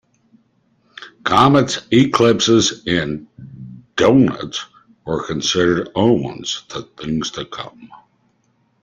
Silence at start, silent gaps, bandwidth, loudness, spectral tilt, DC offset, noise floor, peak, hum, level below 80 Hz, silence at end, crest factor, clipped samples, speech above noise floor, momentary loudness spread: 1 s; none; 9.6 kHz; -17 LUFS; -4.5 dB/octave; under 0.1%; -62 dBFS; 0 dBFS; none; -50 dBFS; 0.85 s; 18 dB; under 0.1%; 45 dB; 21 LU